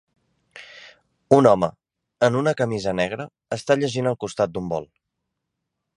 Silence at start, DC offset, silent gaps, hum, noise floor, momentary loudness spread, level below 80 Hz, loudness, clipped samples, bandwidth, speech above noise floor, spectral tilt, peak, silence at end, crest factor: 0.55 s; under 0.1%; none; none; -80 dBFS; 15 LU; -56 dBFS; -22 LUFS; under 0.1%; 11 kHz; 60 dB; -6 dB/octave; 0 dBFS; 1.15 s; 22 dB